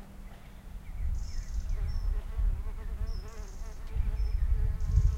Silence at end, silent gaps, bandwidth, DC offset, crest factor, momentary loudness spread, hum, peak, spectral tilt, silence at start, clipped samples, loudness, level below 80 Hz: 0 s; none; 8 kHz; under 0.1%; 18 dB; 16 LU; none; -12 dBFS; -6.5 dB/octave; 0 s; under 0.1%; -36 LUFS; -32 dBFS